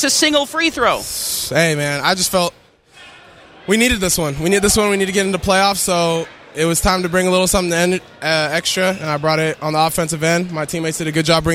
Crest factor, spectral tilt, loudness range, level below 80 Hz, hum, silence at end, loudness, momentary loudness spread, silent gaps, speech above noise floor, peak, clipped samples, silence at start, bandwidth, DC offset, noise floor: 16 dB; -3.5 dB/octave; 2 LU; -38 dBFS; none; 0 s; -16 LUFS; 6 LU; none; 28 dB; 0 dBFS; under 0.1%; 0 s; 16.5 kHz; under 0.1%; -44 dBFS